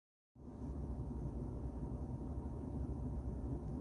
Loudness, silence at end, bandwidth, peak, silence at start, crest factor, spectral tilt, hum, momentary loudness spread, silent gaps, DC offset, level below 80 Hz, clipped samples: -46 LUFS; 0 s; 10.5 kHz; -30 dBFS; 0.35 s; 14 dB; -10.5 dB/octave; none; 4 LU; none; under 0.1%; -48 dBFS; under 0.1%